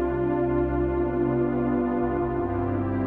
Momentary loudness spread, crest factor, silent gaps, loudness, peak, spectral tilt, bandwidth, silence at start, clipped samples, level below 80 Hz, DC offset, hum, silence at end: 2 LU; 12 dB; none; -25 LUFS; -12 dBFS; -11.5 dB/octave; 3.7 kHz; 0 s; under 0.1%; -38 dBFS; 0.2%; none; 0 s